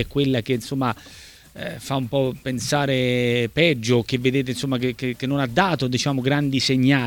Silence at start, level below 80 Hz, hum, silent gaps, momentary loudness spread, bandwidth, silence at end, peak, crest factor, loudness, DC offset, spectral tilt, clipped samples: 0 s; -50 dBFS; none; none; 8 LU; 18.5 kHz; 0 s; -2 dBFS; 20 dB; -22 LUFS; under 0.1%; -5.5 dB/octave; under 0.1%